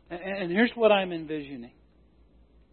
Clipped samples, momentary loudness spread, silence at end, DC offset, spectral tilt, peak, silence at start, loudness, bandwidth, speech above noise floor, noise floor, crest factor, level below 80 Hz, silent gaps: under 0.1%; 16 LU; 1.05 s; under 0.1%; -9.5 dB/octave; -10 dBFS; 0.1 s; -26 LUFS; 4.4 kHz; 34 dB; -60 dBFS; 20 dB; -60 dBFS; none